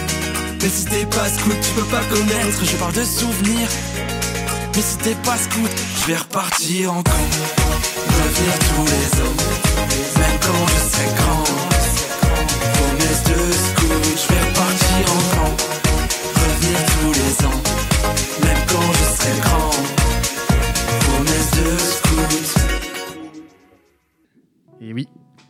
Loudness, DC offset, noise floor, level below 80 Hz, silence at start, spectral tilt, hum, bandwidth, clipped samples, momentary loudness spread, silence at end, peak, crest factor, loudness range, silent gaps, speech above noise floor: -17 LUFS; under 0.1%; -61 dBFS; -24 dBFS; 0 s; -3.5 dB/octave; none; 16.5 kHz; under 0.1%; 5 LU; 0.45 s; -2 dBFS; 16 dB; 3 LU; none; 43 dB